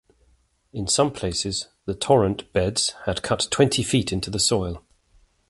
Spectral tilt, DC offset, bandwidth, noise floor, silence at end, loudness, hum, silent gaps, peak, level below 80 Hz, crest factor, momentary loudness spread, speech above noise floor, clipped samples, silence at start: -4 dB/octave; under 0.1%; 11.5 kHz; -62 dBFS; 0.7 s; -23 LUFS; none; none; -4 dBFS; -44 dBFS; 20 dB; 11 LU; 40 dB; under 0.1%; 0.75 s